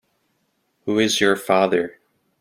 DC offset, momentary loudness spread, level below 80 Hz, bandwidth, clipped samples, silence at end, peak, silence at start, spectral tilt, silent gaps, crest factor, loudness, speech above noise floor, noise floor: under 0.1%; 12 LU; -62 dBFS; 16.5 kHz; under 0.1%; 0.5 s; -2 dBFS; 0.85 s; -3.5 dB/octave; none; 20 dB; -19 LUFS; 51 dB; -69 dBFS